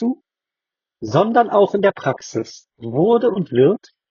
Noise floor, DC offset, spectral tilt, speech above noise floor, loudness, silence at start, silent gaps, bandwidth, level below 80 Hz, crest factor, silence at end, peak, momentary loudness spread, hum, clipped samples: -87 dBFS; under 0.1%; -6 dB/octave; 70 dB; -18 LUFS; 0 s; none; 7.2 kHz; -62 dBFS; 16 dB; 0.35 s; -2 dBFS; 16 LU; none; under 0.1%